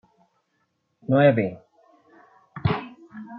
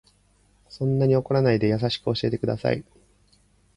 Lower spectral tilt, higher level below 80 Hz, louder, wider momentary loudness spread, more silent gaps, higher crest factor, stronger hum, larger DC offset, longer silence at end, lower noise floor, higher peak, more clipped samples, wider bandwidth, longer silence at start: first, -10.5 dB/octave vs -8 dB/octave; about the same, -56 dBFS vs -52 dBFS; about the same, -22 LUFS vs -24 LUFS; first, 24 LU vs 6 LU; neither; about the same, 22 dB vs 18 dB; second, none vs 50 Hz at -50 dBFS; neither; second, 0 s vs 0.95 s; first, -72 dBFS vs -61 dBFS; first, -4 dBFS vs -8 dBFS; neither; second, 5.6 kHz vs 10.5 kHz; first, 1.1 s vs 0.7 s